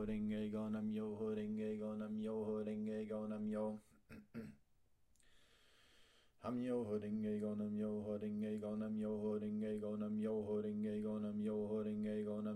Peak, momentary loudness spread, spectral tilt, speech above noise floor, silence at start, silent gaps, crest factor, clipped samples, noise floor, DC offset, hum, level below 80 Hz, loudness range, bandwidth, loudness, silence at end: -32 dBFS; 4 LU; -8.5 dB/octave; 35 dB; 0 s; none; 12 dB; under 0.1%; -78 dBFS; under 0.1%; none; -72 dBFS; 7 LU; 9.8 kHz; -43 LUFS; 0 s